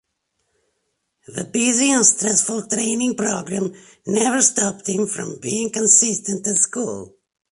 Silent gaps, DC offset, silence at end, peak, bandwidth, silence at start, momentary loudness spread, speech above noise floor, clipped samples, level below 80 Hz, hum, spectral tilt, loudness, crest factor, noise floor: none; under 0.1%; 0.45 s; 0 dBFS; 11.5 kHz; 1.3 s; 14 LU; 53 dB; under 0.1%; -64 dBFS; none; -2.5 dB/octave; -18 LUFS; 20 dB; -73 dBFS